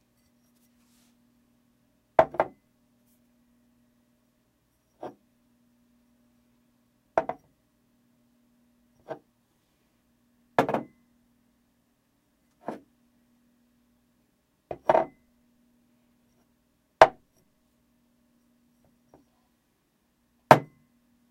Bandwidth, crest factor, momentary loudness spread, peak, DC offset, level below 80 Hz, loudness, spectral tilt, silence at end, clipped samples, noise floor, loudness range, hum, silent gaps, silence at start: 16 kHz; 32 dB; 24 LU; 0 dBFS; under 0.1%; -66 dBFS; -25 LUFS; -5.5 dB/octave; 0.65 s; under 0.1%; -72 dBFS; 14 LU; 60 Hz at -70 dBFS; none; 2.2 s